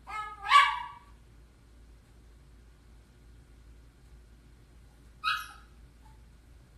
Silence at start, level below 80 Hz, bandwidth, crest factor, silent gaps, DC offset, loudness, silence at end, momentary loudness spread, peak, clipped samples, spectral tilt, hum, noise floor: 0.05 s; -56 dBFS; 14 kHz; 26 dB; none; under 0.1%; -27 LUFS; 1.25 s; 24 LU; -8 dBFS; under 0.1%; -0.5 dB/octave; none; -56 dBFS